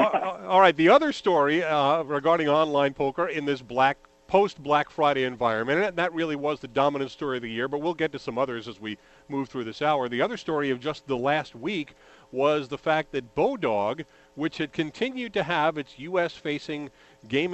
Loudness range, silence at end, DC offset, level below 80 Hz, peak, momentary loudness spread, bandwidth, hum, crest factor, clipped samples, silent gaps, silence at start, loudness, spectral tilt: 6 LU; 0 s; under 0.1%; -62 dBFS; -4 dBFS; 11 LU; 8.4 kHz; none; 20 dB; under 0.1%; none; 0 s; -25 LUFS; -6 dB/octave